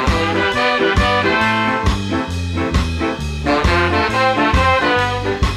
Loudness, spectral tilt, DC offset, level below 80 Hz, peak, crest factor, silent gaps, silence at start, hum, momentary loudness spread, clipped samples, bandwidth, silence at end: -16 LUFS; -5.5 dB/octave; under 0.1%; -24 dBFS; -4 dBFS; 12 dB; none; 0 s; none; 7 LU; under 0.1%; 14 kHz; 0 s